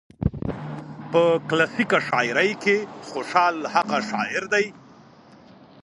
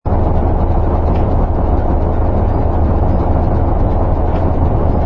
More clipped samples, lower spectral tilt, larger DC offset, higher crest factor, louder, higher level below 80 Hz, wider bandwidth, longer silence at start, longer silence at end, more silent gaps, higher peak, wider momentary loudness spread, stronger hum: neither; second, -5 dB/octave vs -11.5 dB/octave; neither; first, 22 dB vs 12 dB; second, -22 LUFS vs -15 LUFS; second, -46 dBFS vs -14 dBFS; first, 11.5 kHz vs 4.1 kHz; first, 0.2 s vs 0.05 s; first, 1.05 s vs 0 s; neither; about the same, -2 dBFS vs 0 dBFS; first, 12 LU vs 1 LU; neither